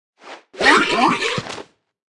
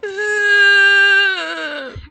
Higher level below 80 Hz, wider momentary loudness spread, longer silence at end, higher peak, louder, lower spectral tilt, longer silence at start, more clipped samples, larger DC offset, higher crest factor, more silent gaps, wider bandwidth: second, -54 dBFS vs -48 dBFS; first, 20 LU vs 16 LU; first, 0.5 s vs 0.05 s; about the same, 0 dBFS vs -2 dBFS; second, -16 LUFS vs -11 LUFS; first, -3 dB/octave vs -1 dB/octave; first, 0.25 s vs 0.05 s; neither; neither; first, 20 dB vs 12 dB; neither; first, 12 kHz vs 9.4 kHz